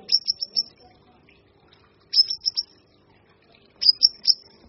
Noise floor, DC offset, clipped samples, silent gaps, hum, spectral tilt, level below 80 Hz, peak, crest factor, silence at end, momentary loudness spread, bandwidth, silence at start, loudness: -58 dBFS; under 0.1%; under 0.1%; none; none; 2.5 dB/octave; -68 dBFS; -2 dBFS; 24 dB; 0.35 s; 12 LU; 6.2 kHz; 0.1 s; -20 LUFS